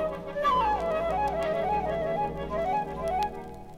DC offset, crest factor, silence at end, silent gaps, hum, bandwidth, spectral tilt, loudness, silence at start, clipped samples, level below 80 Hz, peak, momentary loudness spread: under 0.1%; 14 dB; 0 s; none; 60 Hz at -50 dBFS; 15.5 kHz; -6 dB/octave; -28 LUFS; 0 s; under 0.1%; -46 dBFS; -14 dBFS; 6 LU